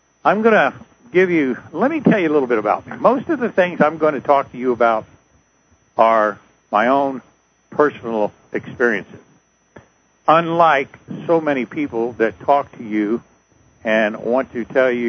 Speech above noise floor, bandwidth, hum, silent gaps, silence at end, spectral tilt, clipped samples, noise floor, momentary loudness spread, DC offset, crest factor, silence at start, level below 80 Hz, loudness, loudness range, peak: 41 dB; 6.6 kHz; none; none; 0 s; -7 dB/octave; under 0.1%; -58 dBFS; 9 LU; under 0.1%; 18 dB; 0.25 s; -60 dBFS; -18 LUFS; 4 LU; 0 dBFS